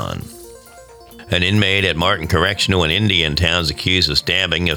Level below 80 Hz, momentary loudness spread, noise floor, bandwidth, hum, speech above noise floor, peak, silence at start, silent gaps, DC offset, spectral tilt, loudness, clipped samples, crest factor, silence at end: -36 dBFS; 5 LU; -41 dBFS; 19.5 kHz; none; 25 dB; -2 dBFS; 0 s; none; under 0.1%; -4.5 dB/octave; -15 LUFS; under 0.1%; 16 dB; 0 s